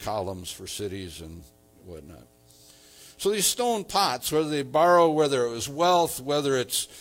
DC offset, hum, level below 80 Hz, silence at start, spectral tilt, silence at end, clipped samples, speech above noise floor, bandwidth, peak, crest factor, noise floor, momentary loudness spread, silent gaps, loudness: under 0.1%; none; -58 dBFS; 0 s; -3.5 dB/octave; 0 s; under 0.1%; 29 dB; 17 kHz; -8 dBFS; 18 dB; -54 dBFS; 21 LU; none; -24 LUFS